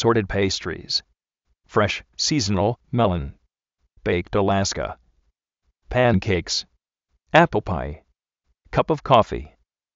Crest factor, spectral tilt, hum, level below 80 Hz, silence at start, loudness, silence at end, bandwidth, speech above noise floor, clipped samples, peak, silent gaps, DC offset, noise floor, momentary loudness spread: 22 dB; -4 dB/octave; none; -42 dBFS; 0 s; -22 LUFS; 0.5 s; 8 kHz; 52 dB; under 0.1%; 0 dBFS; none; under 0.1%; -73 dBFS; 12 LU